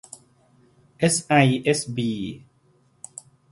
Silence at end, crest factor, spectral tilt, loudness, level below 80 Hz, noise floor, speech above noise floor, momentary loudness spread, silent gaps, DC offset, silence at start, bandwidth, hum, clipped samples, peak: 1.15 s; 22 dB; -4.5 dB/octave; -21 LUFS; -60 dBFS; -61 dBFS; 40 dB; 25 LU; none; under 0.1%; 1 s; 11.5 kHz; none; under 0.1%; -2 dBFS